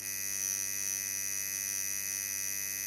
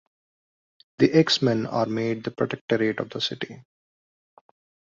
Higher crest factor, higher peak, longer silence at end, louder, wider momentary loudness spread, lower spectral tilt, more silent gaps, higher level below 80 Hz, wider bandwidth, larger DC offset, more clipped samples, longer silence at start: about the same, 18 dB vs 22 dB; second, -18 dBFS vs -4 dBFS; second, 0 s vs 1.35 s; second, -32 LUFS vs -24 LUFS; second, 1 LU vs 9 LU; second, 1 dB/octave vs -5.5 dB/octave; second, none vs 2.61-2.68 s; about the same, -70 dBFS vs -66 dBFS; first, 17 kHz vs 7.6 kHz; neither; neither; second, 0 s vs 1 s